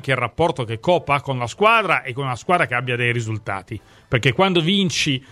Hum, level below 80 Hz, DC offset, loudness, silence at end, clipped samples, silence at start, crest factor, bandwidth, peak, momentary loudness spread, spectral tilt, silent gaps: none; -50 dBFS; under 0.1%; -19 LUFS; 0.1 s; under 0.1%; 0.05 s; 18 dB; 13 kHz; -2 dBFS; 10 LU; -5 dB/octave; none